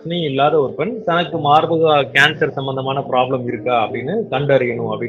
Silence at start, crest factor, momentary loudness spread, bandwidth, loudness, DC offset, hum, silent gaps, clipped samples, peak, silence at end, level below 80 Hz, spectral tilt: 0 s; 16 dB; 8 LU; 13 kHz; -17 LUFS; under 0.1%; none; none; under 0.1%; 0 dBFS; 0 s; -56 dBFS; -6 dB/octave